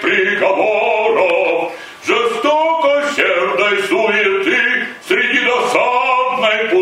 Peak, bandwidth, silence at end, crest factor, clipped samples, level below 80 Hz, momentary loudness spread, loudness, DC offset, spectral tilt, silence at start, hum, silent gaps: 0 dBFS; 16 kHz; 0 s; 14 dB; under 0.1%; -60 dBFS; 3 LU; -14 LUFS; under 0.1%; -3 dB/octave; 0 s; none; none